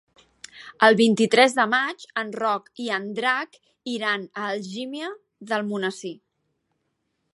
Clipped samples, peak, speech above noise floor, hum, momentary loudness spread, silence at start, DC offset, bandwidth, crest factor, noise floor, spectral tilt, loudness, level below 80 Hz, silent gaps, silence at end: under 0.1%; -2 dBFS; 52 dB; none; 19 LU; 0.55 s; under 0.1%; 11.5 kHz; 24 dB; -75 dBFS; -4 dB/octave; -23 LUFS; -78 dBFS; none; 1.2 s